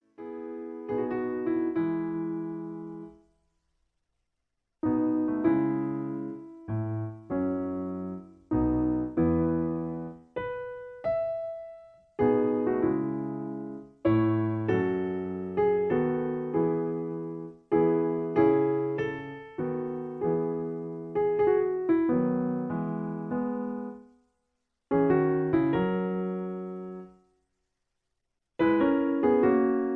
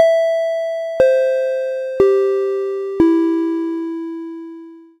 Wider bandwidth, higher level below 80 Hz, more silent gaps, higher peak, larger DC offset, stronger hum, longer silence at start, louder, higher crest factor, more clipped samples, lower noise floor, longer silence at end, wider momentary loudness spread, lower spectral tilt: second, 4.3 kHz vs 9.4 kHz; about the same, -54 dBFS vs -52 dBFS; neither; second, -10 dBFS vs 0 dBFS; neither; neither; first, 0.2 s vs 0 s; second, -29 LUFS vs -17 LUFS; about the same, 18 dB vs 16 dB; neither; first, -83 dBFS vs -37 dBFS; second, 0 s vs 0.2 s; about the same, 14 LU vs 15 LU; first, -10.5 dB/octave vs -6 dB/octave